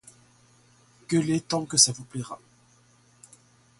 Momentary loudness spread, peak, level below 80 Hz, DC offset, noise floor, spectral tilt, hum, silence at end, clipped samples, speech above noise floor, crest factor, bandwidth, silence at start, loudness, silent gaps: 19 LU; -4 dBFS; -66 dBFS; under 0.1%; -60 dBFS; -3 dB/octave; none; 1.45 s; under 0.1%; 35 dB; 24 dB; 12 kHz; 1.1 s; -24 LUFS; none